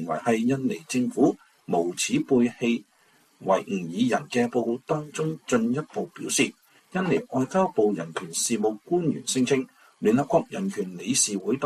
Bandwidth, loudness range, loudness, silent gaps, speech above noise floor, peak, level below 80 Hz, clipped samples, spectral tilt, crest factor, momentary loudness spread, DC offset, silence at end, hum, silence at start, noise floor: 14 kHz; 2 LU; -25 LUFS; none; 37 dB; -8 dBFS; -66 dBFS; under 0.1%; -4.5 dB/octave; 18 dB; 8 LU; under 0.1%; 0 s; none; 0 s; -61 dBFS